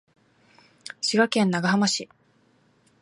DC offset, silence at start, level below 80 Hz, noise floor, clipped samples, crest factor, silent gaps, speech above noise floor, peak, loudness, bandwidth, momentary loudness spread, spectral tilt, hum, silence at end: under 0.1%; 1 s; -70 dBFS; -63 dBFS; under 0.1%; 18 dB; none; 40 dB; -8 dBFS; -23 LUFS; 11.5 kHz; 21 LU; -4 dB/octave; none; 1 s